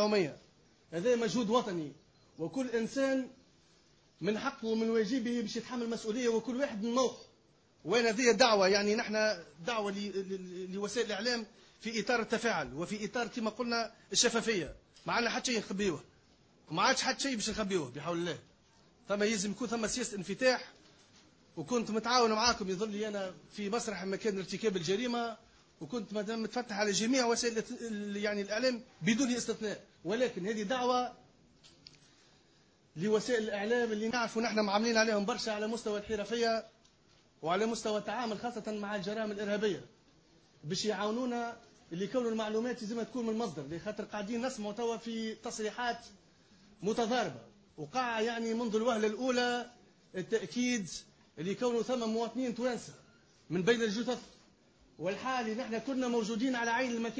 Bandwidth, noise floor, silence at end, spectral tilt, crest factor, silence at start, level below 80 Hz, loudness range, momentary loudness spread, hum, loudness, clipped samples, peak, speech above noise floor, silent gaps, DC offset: 8 kHz; -67 dBFS; 0 s; -3.5 dB/octave; 22 dB; 0 s; -68 dBFS; 5 LU; 11 LU; none; -34 LUFS; under 0.1%; -12 dBFS; 33 dB; none; under 0.1%